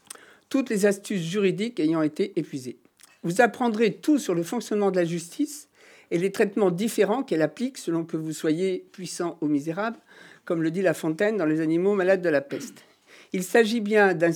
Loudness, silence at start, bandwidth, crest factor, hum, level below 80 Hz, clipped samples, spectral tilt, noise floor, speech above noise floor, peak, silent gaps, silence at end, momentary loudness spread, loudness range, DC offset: -25 LUFS; 0.5 s; 19.5 kHz; 20 dB; none; -90 dBFS; under 0.1%; -5.5 dB/octave; -48 dBFS; 23 dB; -6 dBFS; none; 0 s; 12 LU; 3 LU; under 0.1%